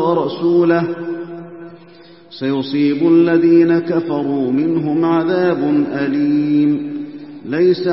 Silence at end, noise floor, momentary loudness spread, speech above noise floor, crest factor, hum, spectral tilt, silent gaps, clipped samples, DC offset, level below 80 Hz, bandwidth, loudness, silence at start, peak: 0 s; -42 dBFS; 16 LU; 28 dB; 14 dB; none; -11.5 dB/octave; none; under 0.1%; 0.2%; -66 dBFS; 5.8 kHz; -15 LUFS; 0 s; -2 dBFS